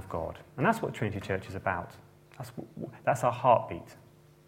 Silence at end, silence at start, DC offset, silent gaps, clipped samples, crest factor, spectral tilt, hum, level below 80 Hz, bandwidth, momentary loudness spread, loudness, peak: 0.5 s; 0 s; under 0.1%; none; under 0.1%; 22 dB; -6.5 dB/octave; none; -60 dBFS; 16.5 kHz; 18 LU; -30 LUFS; -10 dBFS